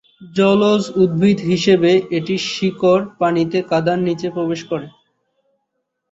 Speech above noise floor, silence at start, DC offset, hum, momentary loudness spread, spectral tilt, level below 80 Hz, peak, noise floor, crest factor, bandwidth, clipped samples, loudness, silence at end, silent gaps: 58 dB; 0.2 s; under 0.1%; none; 8 LU; -6 dB/octave; -56 dBFS; -2 dBFS; -74 dBFS; 16 dB; 8 kHz; under 0.1%; -17 LUFS; 1.2 s; none